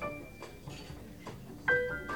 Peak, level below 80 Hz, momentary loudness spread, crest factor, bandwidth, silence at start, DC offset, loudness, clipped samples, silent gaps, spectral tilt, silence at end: -18 dBFS; -56 dBFS; 18 LU; 20 dB; over 20 kHz; 0 s; 0.1%; -34 LUFS; under 0.1%; none; -5 dB/octave; 0 s